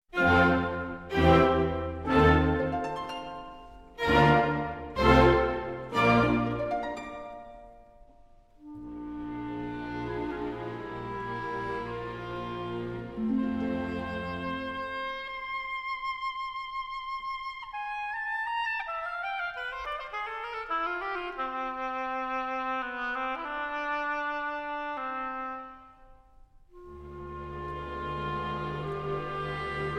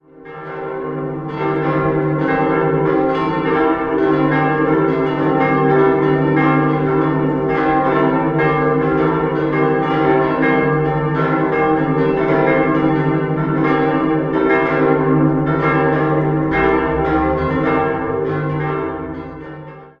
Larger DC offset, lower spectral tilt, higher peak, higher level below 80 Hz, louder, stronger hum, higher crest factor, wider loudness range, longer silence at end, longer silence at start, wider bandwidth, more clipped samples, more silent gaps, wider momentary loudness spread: neither; second, -7 dB/octave vs -9.5 dB/octave; second, -8 dBFS vs -2 dBFS; about the same, -44 dBFS vs -40 dBFS; second, -30 LUFS vs -16 LUFS; neither; first, 22 dB vs 14 dB; first, 13 LU vs 2 LU; about the same, 0 s vs 0.1 s; about the same, 0.1 s vs 0.2 s; first, 14 kHz vs 5.6 kHz; neither; neither; first, 16 LU vs 8 LU